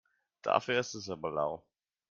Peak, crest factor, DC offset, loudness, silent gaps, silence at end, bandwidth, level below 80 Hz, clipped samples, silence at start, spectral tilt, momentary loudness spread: -10 dBFS; 24 dB; under 0.1%; -34 LUFS; none; 0.5 s; 7.6 kHz; -72 dBFS; under 0.1%; 0.45 s; -4 dB/octave; 10 LU